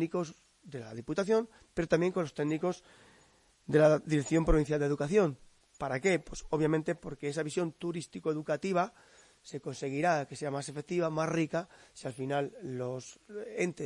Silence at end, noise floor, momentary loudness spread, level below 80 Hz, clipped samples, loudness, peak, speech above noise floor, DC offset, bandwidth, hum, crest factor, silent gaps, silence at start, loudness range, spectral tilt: 0 s; -65 dBFS; 15 LU; -48 dBFS; under 0.1%; -32 LUFS; -12 dBFS; 33 dB; under 0.1%; 11.5 kHz; none; 20 dB; none; 0 s; 5 LU; -6 dB/octave